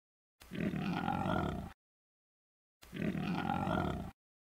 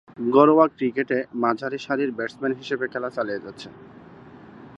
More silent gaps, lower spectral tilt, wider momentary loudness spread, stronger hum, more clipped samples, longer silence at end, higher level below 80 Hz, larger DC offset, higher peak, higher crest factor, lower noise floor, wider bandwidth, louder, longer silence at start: first, 1.74-2.80 s vs none; about the same, -7.5 dB/octave vs -7 dB/octave; about the same, 13 LU vs 15 LU; neither; neither; first, 0.45 s vs 0 s; first, -56 dBFS vs -68 dBFS; neither; second, -22 dBFS vs -2 dBFS; about the same, 18 dB vs 22 dB; first, under -90 dBFS vs -45 dBFS; first, 16 kHz vs 8 kHz; second, -38 LUFS vs -23 LUFS; first, 0.4 s vs 0.2 s